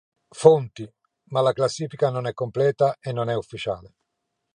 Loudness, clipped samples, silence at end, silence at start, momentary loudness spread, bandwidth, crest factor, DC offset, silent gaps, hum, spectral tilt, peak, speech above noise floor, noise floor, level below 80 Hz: -23 LUFS; under 0.1%; 0.75 s; 0.35 s; 16 LU; 10 kHz; 22 dB; under 0.1%; none; none; -6 dB/octave; -2 dBFS; 56 dB; -79 dBFS; -62 dBFS